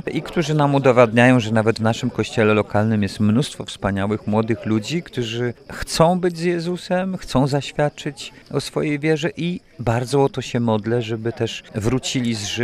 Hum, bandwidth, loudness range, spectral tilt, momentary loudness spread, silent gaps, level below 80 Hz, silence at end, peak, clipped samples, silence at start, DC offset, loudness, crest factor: none; 15 kHz; 5 LU; -6 dB/octave; 10 LU; none; -46 dBFS; 0 s; 0 dBFS; under 0.1%; 0.05 s; under 0.1%; -20 LUFS; 20 dB